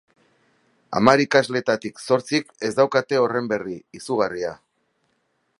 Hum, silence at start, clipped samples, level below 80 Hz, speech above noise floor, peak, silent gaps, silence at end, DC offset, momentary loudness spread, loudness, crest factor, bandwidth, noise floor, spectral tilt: none; 0.9 s; under 0.1%; -64 dBFS; 49 dB; 0 dBFS; none; 1.05 s; under 0.1%; 12 LU; -21 LUFS; 22 dB; 11.5 kHz; -70 dBFS; -5 dB/octave